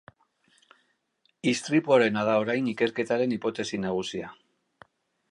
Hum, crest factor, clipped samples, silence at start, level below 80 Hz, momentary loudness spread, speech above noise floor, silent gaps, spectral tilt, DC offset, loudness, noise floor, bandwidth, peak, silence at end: none; 20 dB; under 0.1%; 1.45 s; -68 dBFS; 9 LU; 46 dB; none; -5 dB/octave; under 0.1%; -26 LUFS; -72 dBFS; 11.5 kHz; -8 dBFS; 0.95 s